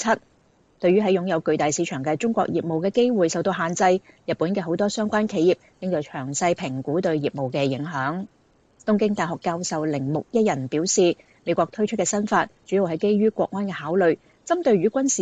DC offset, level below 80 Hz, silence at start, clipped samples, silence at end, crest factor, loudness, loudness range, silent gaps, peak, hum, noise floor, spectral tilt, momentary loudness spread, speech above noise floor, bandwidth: under 0.1%; -64 dBFS; 0 s; under 0.1%; 0 s; 16 dB; -23 LUFS; 3 LU; none; -6 dBFS; none; -60 dBFS; -5 dB/octave; 7 LU; 37 dB; 9.4 kHz